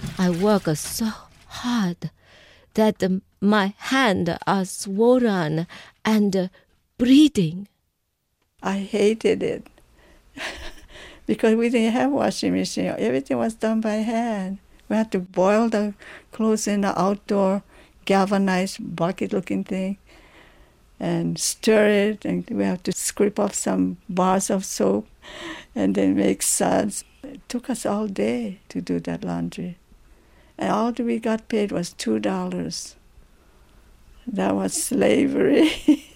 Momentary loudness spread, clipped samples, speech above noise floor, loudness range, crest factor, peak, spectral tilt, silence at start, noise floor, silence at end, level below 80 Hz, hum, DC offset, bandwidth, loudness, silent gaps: 14 LU; under 0.1%; 52 dB; 5 LU; 16 dB; -6 dBFS; -5 dB/octave; 0 s; -73 dBFS; 0.1 s; -52 dBFS; none; under 0.1%; 16 kHz; -22 LUFS; none